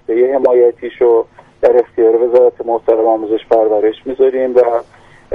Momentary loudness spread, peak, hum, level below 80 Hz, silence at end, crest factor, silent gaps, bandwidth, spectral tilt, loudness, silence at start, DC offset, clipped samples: 5 LU; 0 dBFS; none; -52 dBFS; 0 s; 12 dB; none; 4.5 kHz; -7.5 dB/octave; -13 LUFS; 0.1 s; under 0.1%; under 0.1%